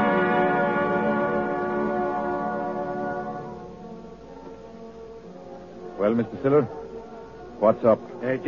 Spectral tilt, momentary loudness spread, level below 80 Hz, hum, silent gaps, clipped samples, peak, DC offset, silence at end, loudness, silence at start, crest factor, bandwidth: -8.5 dB/octave; 20 LU; -56 dBFS; none; none; under 0.1%; -8 dBFS; 0.2%; 0 s; -24 LUFS; 0 s; 18 dB; 7 kHz